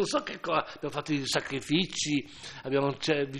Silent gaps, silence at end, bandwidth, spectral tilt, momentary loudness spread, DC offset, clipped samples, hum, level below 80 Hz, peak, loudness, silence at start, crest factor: none; 0 s; 13 kHz; -4 dB/octave; 7 LU; under 0.1%; under 0.1%; none; -62 dBFS; -10 dBFS; -30 LUFS; 0 s; 20 dB